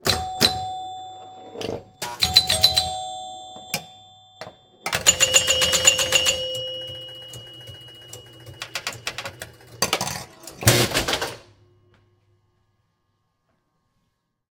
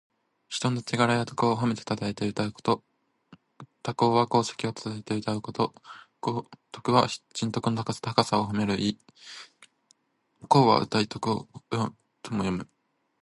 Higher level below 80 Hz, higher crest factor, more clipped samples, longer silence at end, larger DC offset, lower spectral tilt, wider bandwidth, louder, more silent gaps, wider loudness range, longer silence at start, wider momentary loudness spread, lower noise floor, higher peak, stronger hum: first, -50 dBFS vs -60 dBFS; about the same, 26 dB vs 26 dB; neither; first, 3.1 s vs 0.6 s; neither; second, -1.5 dB/octave vs -5.5 dB/octave; first, 18 kHz vs 11.5 kHz; first, -20 LUFS vs -27 LUFS; neither; first, 11 LU vs 2 LU; second, 0.05 s vs 0.5 s; first, 24 LU vs 13 LU; about the same, -74 dBFS vs -71 dBFS; about the same, 0 dBFS vs -2 dBFS; neither